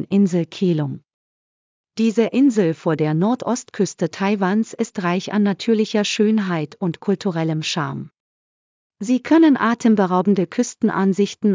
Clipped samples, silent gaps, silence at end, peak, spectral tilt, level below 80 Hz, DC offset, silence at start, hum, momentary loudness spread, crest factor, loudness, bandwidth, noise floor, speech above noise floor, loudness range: under 0.1%; 1.14-1.84 s, 8.20-8.90 s; 0 s; -4 dBFS; -6 dB/octave; -70 dBFS; under 0.1%; 0 s; none; 8 LU; 16 dB; -19 LUFS; 7.6 kHz; under -90 dBFS; over 72 dB; 3 LU